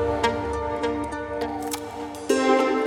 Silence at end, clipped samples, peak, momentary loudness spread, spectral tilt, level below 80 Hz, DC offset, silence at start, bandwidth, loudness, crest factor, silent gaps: 0 s; under 0.1%; -6 dBFS; 11 LU; -4.5 dB/octave; -44 dBFS; under 0.1%; 0 s; 19.5 kHz; -25 LUFS; 18 dB; none